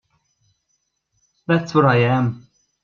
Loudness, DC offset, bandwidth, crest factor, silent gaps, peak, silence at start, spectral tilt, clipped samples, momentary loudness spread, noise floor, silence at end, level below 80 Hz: -18 LUFS; under 0.1%; 7 kHz; 20 dB; none; -2 dBFS; 1.5 s; -7.5 dB/octave; under 0.1%; 19 LU; -71 dBFS; 0.45 s; -60 dBFS